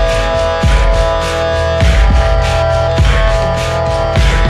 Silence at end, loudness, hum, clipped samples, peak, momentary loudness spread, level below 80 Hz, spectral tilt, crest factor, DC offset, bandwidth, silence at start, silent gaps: 0 s; -12 LUFS; none; under 0.1%; 0 dBFS; 3 LU; -14 dBFS; -5.5 dB/octave; 10 dB; under 0.1%; 12 kHz; 0 s; none